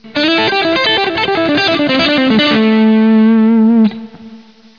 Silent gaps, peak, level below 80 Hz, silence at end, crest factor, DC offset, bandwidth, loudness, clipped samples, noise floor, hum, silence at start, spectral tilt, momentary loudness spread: none; -2 dBFS; -50 dBFS; 0.4 s; 8 dB; 0.4%; 5.4 kHz; -10 LUFS; under 0.1%; -37 dBFS; none; 0.05 s; -6 dB/octave; 4 LU